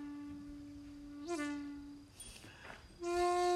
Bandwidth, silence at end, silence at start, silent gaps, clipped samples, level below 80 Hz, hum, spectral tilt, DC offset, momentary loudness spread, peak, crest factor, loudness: 13.5 kHz; 0 s; 0 s; none; under 0.1%; -62 dBFS; none; -4 dB/octave; under 0.1%; 17 LU; -24 dBFS; 16 dB; -42 LUFS